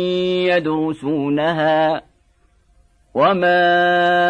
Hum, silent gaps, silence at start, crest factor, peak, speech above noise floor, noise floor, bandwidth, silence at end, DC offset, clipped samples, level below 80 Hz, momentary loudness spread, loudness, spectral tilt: none; none; 0 s; 14 dB; -4 dBFS; 41 dB; -57 dBFS; 9.6 kHz; 0 s; under 0.1%; under 0.1%; -56 dBFS; 7 LU; -17 LUFS; -6.5 dB/octave